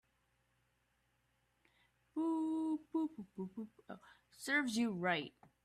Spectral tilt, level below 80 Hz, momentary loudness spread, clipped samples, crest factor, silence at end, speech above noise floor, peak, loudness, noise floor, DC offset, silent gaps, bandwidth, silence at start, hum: -4.5 dB/octave; -82 dBFS; 17 LU; under 0.1%; 20 dB; 0.35 s; 39 dB; -22 dBFS; -39 LUFS; -80 dBFS; under 0.1%; none; 14 kHz; 2.15 s; none